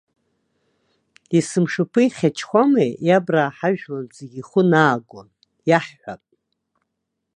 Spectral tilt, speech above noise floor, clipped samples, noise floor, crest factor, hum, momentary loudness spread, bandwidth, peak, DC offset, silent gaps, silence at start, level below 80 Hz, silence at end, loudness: -6.5 dB/octave; 59 dB; under 0.1%; -78 dBFS; 20 dB; none; 17 LU; 11 kHz; 0 dBFS; under 0.1%; none; 1.3 s; -68 dBFS; 1.2 s; -19 LUFS